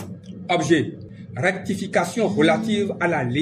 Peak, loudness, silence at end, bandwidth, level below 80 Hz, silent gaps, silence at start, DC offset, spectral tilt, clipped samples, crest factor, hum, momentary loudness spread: -4 dBFS; -21 LUFS; 0 s; 14.5 kHz; -60 dBFS; none; 0 s; under 0.1%; -5.5 dB/octave; under 0.1%; 18 dB; none; 17 LU